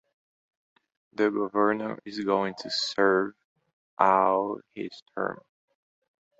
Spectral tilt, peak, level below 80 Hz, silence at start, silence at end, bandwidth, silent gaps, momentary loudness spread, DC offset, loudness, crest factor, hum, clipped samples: -4.5 dB/octave; -4 dBFS; -72 dBFS; 1.2 s; 1.05 s; 8 kHz; 3.44-3.56 s, 3.73-3.97 s, 5.02-5.06 s; 14 LU; under 0.1%; -26 LUFS; 24 dB; none; under 0.1%